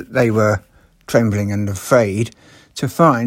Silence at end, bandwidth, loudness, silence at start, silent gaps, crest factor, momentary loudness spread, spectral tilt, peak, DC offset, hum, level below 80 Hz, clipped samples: 0 s; 16.5 kHz; -17 LUFS; 0 s; none; 16 dB; 10 LU; -6.5 dB/octave; 0 dBFS; under 0.1%; none; -50 dBFS; under 0.1%